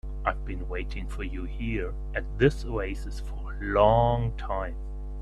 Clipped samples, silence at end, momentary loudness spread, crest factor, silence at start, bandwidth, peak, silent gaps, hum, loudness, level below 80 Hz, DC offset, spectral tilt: under 0.1%; 0 s; 15 LU; 22 dB; 0.05 s; 10.5 kHz; -6 dBFS; none; none; -29 LUFS; -34 dBFS; under 0.1%; -7.5 dB/octave